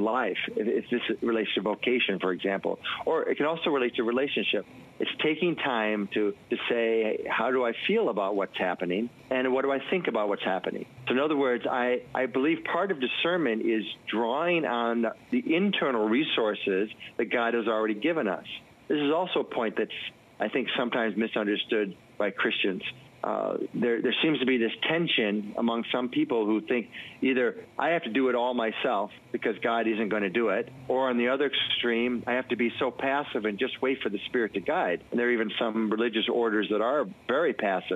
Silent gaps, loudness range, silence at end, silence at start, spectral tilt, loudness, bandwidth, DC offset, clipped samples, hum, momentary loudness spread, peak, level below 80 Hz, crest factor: none; 2 LU; 0 s; 0 s; -6.5 dB/octave; -28 LUFS; 8 kHz; under 0.1%; under 0.1%; none; 6 LU; -12 dBFS; -70 dBFS; 16 dB